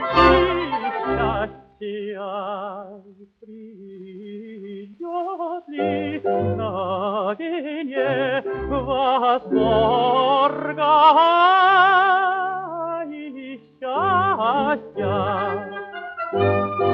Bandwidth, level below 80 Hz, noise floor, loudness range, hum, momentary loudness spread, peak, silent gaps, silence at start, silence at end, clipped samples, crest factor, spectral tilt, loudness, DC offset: 6.6 kHz; -44 dBFS; -47 dBFS; 16 LU; none; 21 LU; -2 dBFS; none; 0 s; 0 s; under 0.1%; 18 dB; -7.5 dB/octave; -20 LUFS; under 0.1%